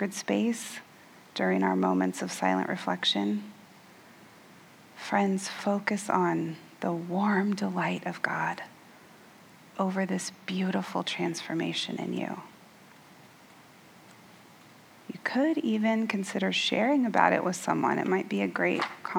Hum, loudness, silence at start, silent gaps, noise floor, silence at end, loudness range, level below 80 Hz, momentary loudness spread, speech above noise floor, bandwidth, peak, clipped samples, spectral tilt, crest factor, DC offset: none; -29 LUFS; 0 s; none; -54 dBFS; 0 s; 8 LU; -82 dBFS; 10 LU; 26 dB; 19 kHz; -6 dBFS; under 0.1%; -5 dB/octave; 24 dB; under 0.1%